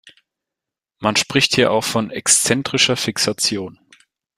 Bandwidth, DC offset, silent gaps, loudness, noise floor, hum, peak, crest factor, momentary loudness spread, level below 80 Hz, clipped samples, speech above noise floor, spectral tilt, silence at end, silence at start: 15.5 kHz; under 0.1%; none; -16 LUFS; -86 dBFS; none; 0 dBFS; 20 dB; 7 LU; -56 dBFS; under 0.1%; 68 dB; -2.5 dB/octave; 0.65 s; 0.05 s